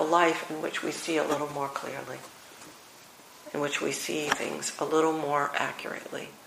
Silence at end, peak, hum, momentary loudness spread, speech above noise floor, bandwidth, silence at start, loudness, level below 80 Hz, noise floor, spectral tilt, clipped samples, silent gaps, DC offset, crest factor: 0 s; -6 dBFS; none; 21 LU; 22 dB; 15.5 kHz; 0 s; -30 LUFS; -72 dBFS; -52 dBFS; -3 dB/octave; under 0.1%; none; under 0.1%; 26 dB